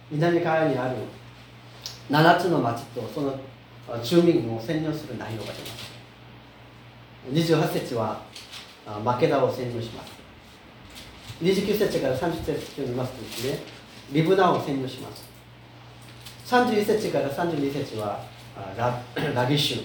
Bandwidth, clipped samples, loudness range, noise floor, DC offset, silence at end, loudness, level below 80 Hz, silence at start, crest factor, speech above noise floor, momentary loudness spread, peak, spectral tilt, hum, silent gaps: over 20 kHz; under 0.1%; 5 LU; -48 dBFS; under 0.1%; 0 s; -25 LUFS; -56 dBFS; 0 s; 24 dB; 23 dB; 22 LU; -2 dBFS; -6 dB/octave; none; none